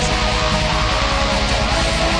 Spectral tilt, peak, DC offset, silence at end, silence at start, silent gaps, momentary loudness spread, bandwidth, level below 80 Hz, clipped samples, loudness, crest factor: -3.5 dB/octave; -6 dBFS; 0.4%; 0 s; 0 s; none; 0 LU; 10.5 kHz; -22 dBFS; under 0.1%; -17 LUFS; 10 dB